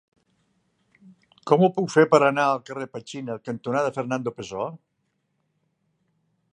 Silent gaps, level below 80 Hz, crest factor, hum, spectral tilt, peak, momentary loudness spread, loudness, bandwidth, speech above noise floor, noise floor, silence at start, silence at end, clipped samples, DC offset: none; -70 dBFS; 22 dB; none; -6 dB/octave; -2 dBFS; 16 LU; -23 LUFS; 9.6 kHz; 51 dB; -74 dBFS; 1.45 s; 1.8 s; under 0.1%; under 0.1%